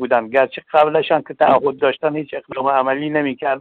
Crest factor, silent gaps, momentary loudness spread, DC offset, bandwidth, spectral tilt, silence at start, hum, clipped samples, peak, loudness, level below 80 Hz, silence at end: 14 dB; none; 7 LU; under 0.1%; 4.5 kHz; -7.5 dB/octave; 0 s; none; under 0.1%; -4 dBFS; -17 LUFS; -62 dBFS; 0 s